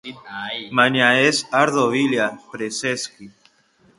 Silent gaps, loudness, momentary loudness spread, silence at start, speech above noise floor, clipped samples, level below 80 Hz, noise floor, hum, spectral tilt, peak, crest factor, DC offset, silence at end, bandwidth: none; -19 LUFS; 15 LU; 0.05 s; 38 dB; under 0.1%; -64 dBFS; -58 dBFS; none; -3.5 dB/octave; 0 dBFS; 20 dB; under 0.1%; 0.7 s; 11.5 kHz